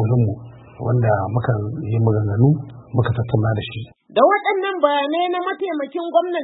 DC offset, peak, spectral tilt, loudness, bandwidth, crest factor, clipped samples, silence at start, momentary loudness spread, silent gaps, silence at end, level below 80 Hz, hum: under 0.1%; 0 dBFS; -12.5 dB/octave; -20 LUFS; 4.1 kHz; 18 dB; under 0.1%; 0 s; 8 LU; none; 0 s; -48 dBFS; none